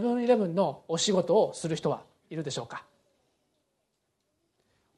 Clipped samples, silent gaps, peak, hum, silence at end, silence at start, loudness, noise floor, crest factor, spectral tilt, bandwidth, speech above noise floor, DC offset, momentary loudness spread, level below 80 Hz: under 0.1%; none; -12 dBFS; none; 2.15 s; 0 s; -28 LUFS; -78 dBFS; 18 dB; -5 dB/octave; 11.5 kHz; 50 dB; under 0.1%; 14 LU; -74 dBFS